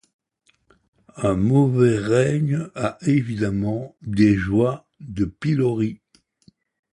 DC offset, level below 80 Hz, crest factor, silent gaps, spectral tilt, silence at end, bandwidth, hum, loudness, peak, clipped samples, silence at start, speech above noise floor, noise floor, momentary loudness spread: under 0.1%; -46 dBFS; 18 dB; none; -8 dB/octave; 1 s; 11 kHz; none; -21 LUFS; -4 dBFS; under 0.1%; 1.15 s; 45 dB; -65 dBFS; 10 LU